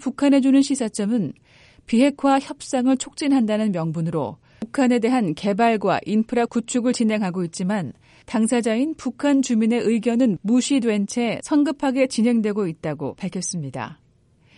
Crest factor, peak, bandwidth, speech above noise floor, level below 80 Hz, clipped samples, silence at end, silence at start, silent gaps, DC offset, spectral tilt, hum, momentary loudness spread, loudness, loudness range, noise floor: 16 dB; -6 dBFS; 11.5 kHz; 37 dB; -60 dBFS; under 0.1%; 0.65 s; 0 s; none; under 0.1%; -5.5 dB/octave; none; 9 LU; -21 LUFS; 2 LU; -58 dBFS